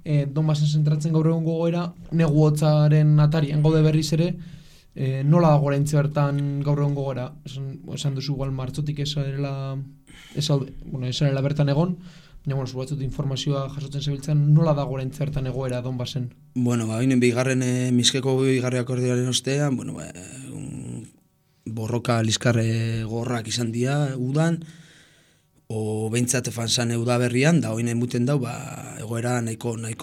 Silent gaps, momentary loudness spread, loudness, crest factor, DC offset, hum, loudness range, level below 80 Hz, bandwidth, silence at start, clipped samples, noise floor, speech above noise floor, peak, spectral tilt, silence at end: none; 15 LU; -23 LUFS; 18 dB; under 0.1%; none; 7 LU; -48 dBFS; 13.5 kHz; 0.05 s; under 0.1%; -62 dBFS; 40 dB; -6 dBFS; -6 dB/octave; 0 s